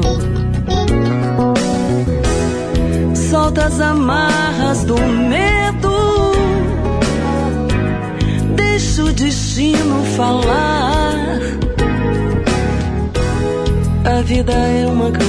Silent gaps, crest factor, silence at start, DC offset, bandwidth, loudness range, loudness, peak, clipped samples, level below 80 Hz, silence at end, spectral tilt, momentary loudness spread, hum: none; 12 dB; 0 s; under 0.1%; 11 kHz; 2 LU; -15 LUFS; -4 dBFS; under 0.1%; -22 dBFS; 0 s; -5.5 dB/octave; 4 LU; none